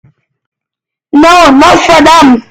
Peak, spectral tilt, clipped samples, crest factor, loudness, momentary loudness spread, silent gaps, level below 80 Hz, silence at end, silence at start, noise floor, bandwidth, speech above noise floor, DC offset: 0 dBFS; -3.5 dB/octave; 8%; 6 dB; -3 LUFS; 4 LU; none; -32 dBFS; 0.1 s; 1.15 s; -82 dBFS; 17 kHz; 79 dB; under 0.1%